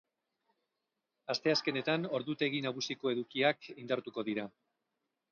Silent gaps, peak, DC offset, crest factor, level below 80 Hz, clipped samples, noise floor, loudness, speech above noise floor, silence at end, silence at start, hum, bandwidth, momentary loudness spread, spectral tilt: none; -16 dBFS; under 0.1%; 20 dB; -84 dBFS; under 0.1%; -87 dBFS; -34 LUFS; 52 dB; 0.8 s; 1.3 s; none; 7 kHz; 8 LU; -3 dB/octave